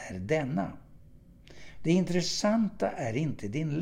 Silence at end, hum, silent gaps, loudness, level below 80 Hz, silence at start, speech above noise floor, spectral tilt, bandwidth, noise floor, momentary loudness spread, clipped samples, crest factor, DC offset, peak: 0 s; none; none; -30 LUFS; -56 dBFS; 0 s; 25 dB; -5.5 dB/octave; 14 kHz; -54 dBFS; 7 LU; under 0.1%; 16 dB; under 0.1%; -14 dBFS